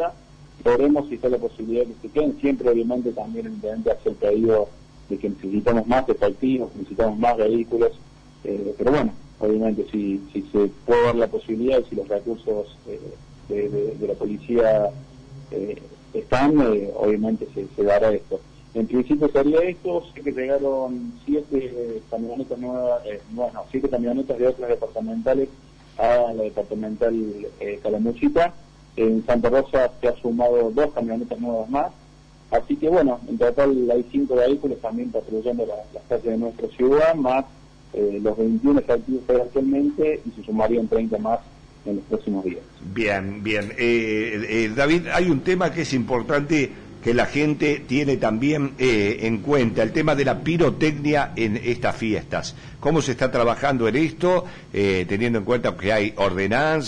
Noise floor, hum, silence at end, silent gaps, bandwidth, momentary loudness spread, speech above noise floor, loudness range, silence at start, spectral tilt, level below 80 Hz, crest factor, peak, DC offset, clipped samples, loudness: -48 dBFS; none; 0 s; none; 10 kHz; 10 LU; 27 dB; 4 LU; 0 s; -6.5 dB/octave; -44 dBFS; 12 dB; -8 dBFS; under 0.1%; under 0.1%; -22 LUFS